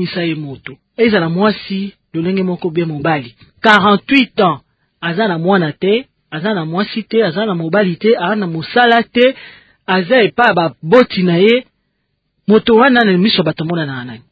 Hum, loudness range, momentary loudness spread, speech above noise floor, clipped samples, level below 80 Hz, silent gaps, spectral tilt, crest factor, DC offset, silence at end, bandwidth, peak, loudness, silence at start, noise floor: none; 4 LU; 13 LU; 54 dB; under 0.1%; -52 dBFS; none; -7.5 dB/octave; 14 dB; under 0.1%; 0.15 s; 8 kHz; 0 dBFS; -13 LUFS; 0 s; -67 dBFS